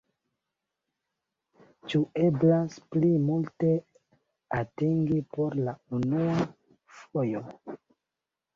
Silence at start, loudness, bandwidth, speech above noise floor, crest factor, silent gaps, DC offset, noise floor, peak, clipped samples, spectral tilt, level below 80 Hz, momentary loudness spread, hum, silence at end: 1.85 s; -28 LUFS; 7.2 kHz; 61 dB; 16 dB; none; under 0.1%; -88 dBFS; -12 dBFS; under 0.1%; -9 dB/octave; -64 dBFS; 12 LU; none; 0.8 s